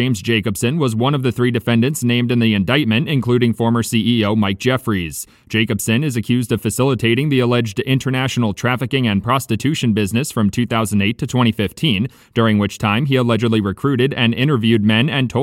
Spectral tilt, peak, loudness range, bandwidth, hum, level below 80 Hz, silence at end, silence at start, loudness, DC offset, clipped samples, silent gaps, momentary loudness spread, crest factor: -5.5 dB/octave; -2 dBFS; 2 LU; 16.5 kHz; none; -50 dBFS; 0 s; 0 s; -17 LUFS; under 0.1%; under 0.1%; none; 4 LU; 14 dB